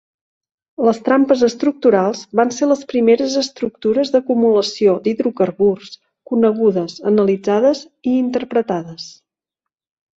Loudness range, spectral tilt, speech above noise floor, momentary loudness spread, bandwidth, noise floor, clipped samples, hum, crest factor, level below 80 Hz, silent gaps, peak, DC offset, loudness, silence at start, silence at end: 2 LU; -5.5 dB/octave; 68 dB; 8 LU; 8 kHz; -84 dBFS; under 0.1%; none; 14 dB; -60 dBFS; none; -2 dBFS; under 0.1%; -16 LUFS; 0.8 s; 1.05 s